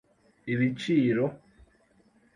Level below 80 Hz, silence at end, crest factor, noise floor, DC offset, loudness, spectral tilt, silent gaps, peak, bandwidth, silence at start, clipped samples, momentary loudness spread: -64 dBFS; 1 s; 16 dB; -64 dBFS; under 0.1%; -27 LUFS; -7.5 dB/octave; none; -14 dBFS; 10.5 kHz; 0.45 s; under 0.1%; 8 LU